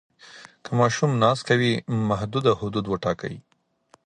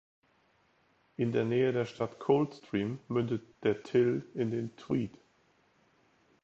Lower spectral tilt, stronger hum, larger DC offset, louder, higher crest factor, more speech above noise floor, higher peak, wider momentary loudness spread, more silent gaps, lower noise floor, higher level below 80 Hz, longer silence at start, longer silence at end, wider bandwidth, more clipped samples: second, -6 dB/octave vs -8 dB/octave; neither; neither; first, -23 LUFS vs -32 LUFS; about the same, 20 dB vs 20 dB; about the same, 37 dB vs 39 dB; first, -4 dBFS vs -12 dBFS; first, 11 LU vs 7 LU; neither; second, -60 dBFS vs -70 dBFS; first, -54 dBFS vs -70 dBFS; second, 0.25 s vs 1.2 s; second, 0.65 s vs 1.35 s; first, 9.8 kHz vs 7.8 kHz; neither